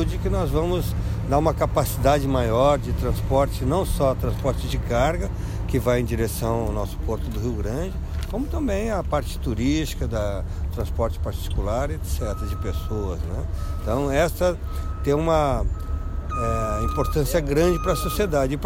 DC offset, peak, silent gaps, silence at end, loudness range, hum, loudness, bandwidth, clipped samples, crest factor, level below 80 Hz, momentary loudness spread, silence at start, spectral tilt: under 0.1%; -6 dBFS; none; 0 s; 5 LU; none; -24 LUFS; 16.5 kHz; under 0.1%; 18 dB; -28 dBFS; 8 LU; 0 s; -6.5 dB/octave